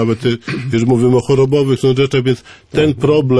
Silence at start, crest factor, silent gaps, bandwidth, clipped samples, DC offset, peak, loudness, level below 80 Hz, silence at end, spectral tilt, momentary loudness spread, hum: 0 s; 10 dB; none; 11 kHz; under 0.1%; under 0.1%; -2 dBFS; -14 LUFS; -44 dBFS; 0 s; -7 dB/octave; 7 LU; none